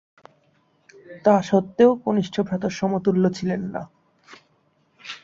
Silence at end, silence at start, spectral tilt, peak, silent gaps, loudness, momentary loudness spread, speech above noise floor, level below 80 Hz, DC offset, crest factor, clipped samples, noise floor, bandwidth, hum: 0.05 s; 1.1 s; -7 dB/octave; -4 dBFS; none; -21 LUFS; 17 LU; 43 dB; -60 dBFS; under 0.1%; 18 dB; under 0.1%; -64 dBFS; 7.6 kHz; none